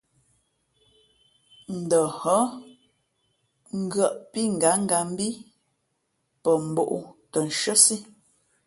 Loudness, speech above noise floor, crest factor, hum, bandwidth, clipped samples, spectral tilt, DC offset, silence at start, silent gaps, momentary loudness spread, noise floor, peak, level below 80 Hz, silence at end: -23 LUFS; 51 dB; 26 dB; none; 12 kHz; under 0.1%; -3 dB/octave; under 0.1%; 1.7 s; none; 16 LU; -75 dBFS; -2 dBFS; -70 dBFS; 0.6 s